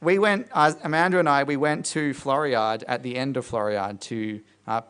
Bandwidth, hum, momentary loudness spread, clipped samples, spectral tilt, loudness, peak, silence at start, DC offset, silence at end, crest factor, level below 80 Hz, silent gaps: 10.5 kHz; none; 10 LU; under 0.1%; -5 dB/octave; -24 LUFS; -4 dBFS; 0 s; under 0.1%; 0.05 s; 20 dB; -64 dBFS; none